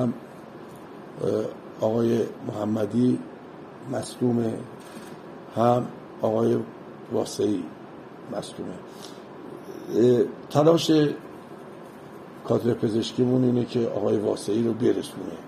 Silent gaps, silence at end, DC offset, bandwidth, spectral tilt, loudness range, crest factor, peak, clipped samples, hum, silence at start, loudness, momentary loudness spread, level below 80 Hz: none; 0 s; under 0.1%; 14.5 kHz; -6.5 dB/octave; 5 LU; 20 dB; -4 dBFS; under 0.1%; none; 0 s; -25 LUFS; 21 LU; -68 dBFS